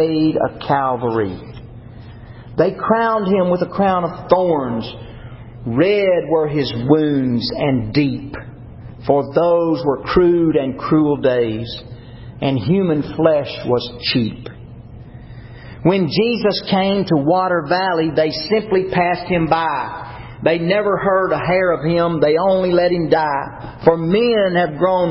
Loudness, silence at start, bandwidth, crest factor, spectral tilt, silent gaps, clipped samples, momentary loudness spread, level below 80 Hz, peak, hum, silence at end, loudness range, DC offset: -17 LUFS; 0 s; 5.8 kHz; 18 dB; -10.5 dB/octave; none; under 0.1%; 21 LU; -44 dBFS; 0 dBFS; none; 0 s; 3 LU; under 0.1%